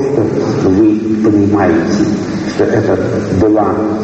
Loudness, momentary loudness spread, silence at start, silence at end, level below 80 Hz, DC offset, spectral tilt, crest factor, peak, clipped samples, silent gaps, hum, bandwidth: -12 LUFS; 4 LU; 0 s; 0 s; -40 dBFS; under 0.1%; -7.5 dB/octave; 10 dB; 0 dBFS; under 0.1%; none; none; 8 kHz